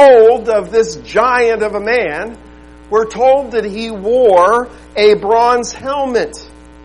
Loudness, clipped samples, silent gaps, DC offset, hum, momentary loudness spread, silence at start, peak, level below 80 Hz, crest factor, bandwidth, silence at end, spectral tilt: -13 LUFS; under 0.1%; none; 0.3%; 60 Hz at -40 dBFS; 12 LU; 0 s; 0 dBFS; -42 dBFS; 12 dB; 11 kHz; 0.4 s; -4 dB/octave